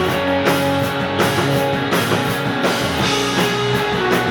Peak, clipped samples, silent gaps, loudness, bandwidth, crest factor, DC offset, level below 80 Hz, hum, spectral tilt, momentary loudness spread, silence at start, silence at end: -2 dBFS; under 0.1%; none; -17 LUFS; 19 kHz; 16 dB; under 0.1%; -44 dBFS; none; -4.5 dB/octave; 2 LU; 0 s; 0 s